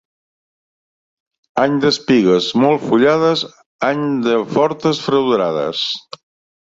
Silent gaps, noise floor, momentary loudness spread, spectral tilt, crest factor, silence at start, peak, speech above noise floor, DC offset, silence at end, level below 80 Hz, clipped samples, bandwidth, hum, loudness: 3.66-3.79 s; under -90 dBFS; 8 LU; -5.5 dB/octave; 16 dB; 1.55 s; -2 dBFS; over 75 dB; under 0.1%; 0.65 s; -58 dBFS; under 0.1%; 7.8 kHz; none; -16 LUFS